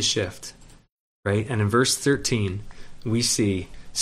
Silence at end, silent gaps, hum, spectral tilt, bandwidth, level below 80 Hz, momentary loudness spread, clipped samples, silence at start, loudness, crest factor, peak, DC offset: 0 s; 0.92-1.23 s; none; -4 dB/octave; 14 kHz; -48 dBFS; 15 LU; under 0.1%; 0 s; -24 LUFS; 18 dB; -6 dBFS; under 0.1%